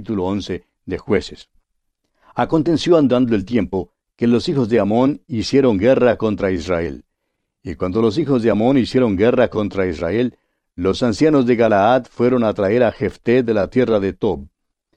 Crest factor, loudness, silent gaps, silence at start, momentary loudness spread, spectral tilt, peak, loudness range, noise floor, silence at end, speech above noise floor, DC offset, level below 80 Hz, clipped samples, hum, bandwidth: 16 dB; -17 LUFS; none; 0 s; 11 LU; -7 dB/octave; -2 dBFS; 3 LU; -74 dBFS; 0.5 s; 58 dB; under 0.1%; -44 dBFS; under 0.1%; none; 9.4 kHz